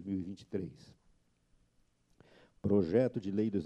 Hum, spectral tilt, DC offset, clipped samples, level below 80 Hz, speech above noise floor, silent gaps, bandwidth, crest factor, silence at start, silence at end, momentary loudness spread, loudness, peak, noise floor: none; -9 dB/octave; under 0.1%; under 0.1%; -66 dBFS; 39 dB; none; 8.6 kHz; 20 dB; 0 s; 0 s; 12 LU; -34 LUFS; -16 dBFS; -72 dBFS